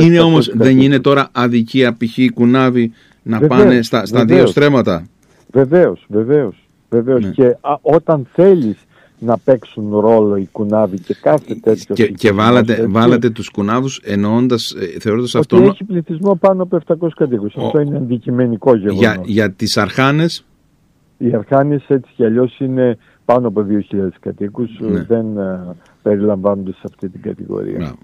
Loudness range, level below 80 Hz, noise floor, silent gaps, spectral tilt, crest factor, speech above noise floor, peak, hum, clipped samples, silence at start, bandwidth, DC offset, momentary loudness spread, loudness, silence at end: 5 LU; -50 dBFS; -54 dBFS; none; -7 dB/octave; 14 dB; 42 dB; 0 dBFS; none; under 0.1%; 0 s; 14 kHz; under 0.1%; 12 LU; -14 LUFS; 0.1 s